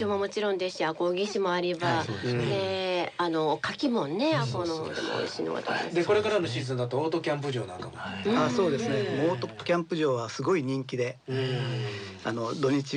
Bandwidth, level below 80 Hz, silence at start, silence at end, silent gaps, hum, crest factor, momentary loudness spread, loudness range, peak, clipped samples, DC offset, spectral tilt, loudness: 10 kHz; -68 dBFS; 0 s; 0 s; none; none; 14 dB; 6 LU; 1 LU; -14 dBFS; under 0.1%; under 0.1%; -5.5 dB/octave; -29 LUFS